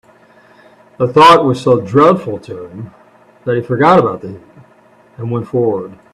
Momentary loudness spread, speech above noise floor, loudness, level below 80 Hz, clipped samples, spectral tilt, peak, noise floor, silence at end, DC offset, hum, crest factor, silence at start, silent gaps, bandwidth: 22 LU; 34 dB; -12 LUFS; -52 dBFS; under 0.1%; -6.5 dB/octave; 0 dBFS; -47 dBFS; 0.2 s; under 0.1%; none; 14 dB; 1 s; none; 13 kHz